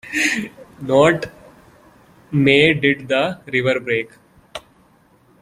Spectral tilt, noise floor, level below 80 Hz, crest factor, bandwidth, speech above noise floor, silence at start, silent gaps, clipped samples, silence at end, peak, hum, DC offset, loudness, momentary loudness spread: -5 dB/octave; -54 dBFS; -54 dBFS; 18 dB; 15.5 kHz; 37 dB; 0.05 s; none; under 0.1%; 0.85 s; -2 dBFS; none; under 0.1%; -17 LUFS; 22 LU